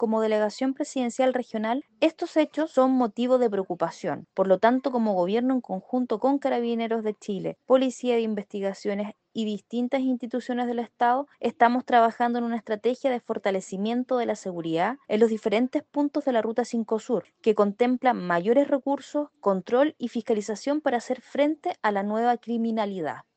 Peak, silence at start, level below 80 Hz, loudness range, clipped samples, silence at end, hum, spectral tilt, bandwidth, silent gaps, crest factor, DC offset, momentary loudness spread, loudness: -6 dBFS; 0 s; -74 dBFS; 3 LU; under 0.1%; 0.15 s; none; -6 dB/octave; 8.8 kHz; none; 20 dB; under 0.1%; 8 LU; -26 LUFS